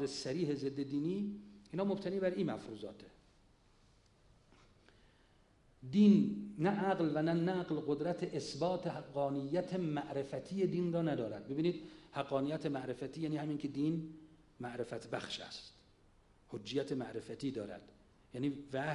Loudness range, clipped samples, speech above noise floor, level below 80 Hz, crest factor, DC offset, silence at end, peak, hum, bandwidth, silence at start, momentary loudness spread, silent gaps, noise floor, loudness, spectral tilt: 10 LU; under 0.1%; 31 dB; -70 dBFS; 20 dB; under 0.1%; 0 s; -18 dBFS; none; 11 kHz; 0 s; 14 LU; none; -68 dBFS; -37 LUFS; -7 dB/octave